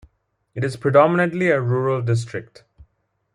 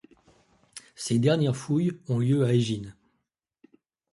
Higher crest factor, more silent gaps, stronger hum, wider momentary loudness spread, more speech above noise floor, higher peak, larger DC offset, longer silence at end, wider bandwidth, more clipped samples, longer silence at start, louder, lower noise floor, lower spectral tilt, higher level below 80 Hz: about the same, 20 dB vs 18 dB; neither; neither; second, 16 LU vs 22 LU; second, 49 dB vs 55 dB; first, -2 dBFS vs -10 dBFS; neither; second, 0.5 s vs 1.2 s; about the same, 11 kHz vs 11.5 kHz; neither; second, 0.55 s vs 0.75 s; first, -19 LUFS vs -26 LUFS; second, -68 dBFS vs -79 dBFS; about the same, -7.5 dB/octave vs -6.5 dB/octave; about the same, -58 dBFS vs -62 dBFS